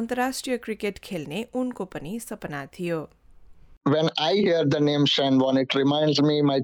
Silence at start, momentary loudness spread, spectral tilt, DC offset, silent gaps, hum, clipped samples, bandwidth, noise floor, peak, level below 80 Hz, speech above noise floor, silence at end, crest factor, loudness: 0 s; 13 LU; -5.5 dB/octave; under 0.1%; 3.77-3.81 s; none; under 0.1%; 17.5 kHz; -49 dBFS; -12 dBFS; -58 dBFS; 25 dB; 0 s; 12 dB; -24 LUFS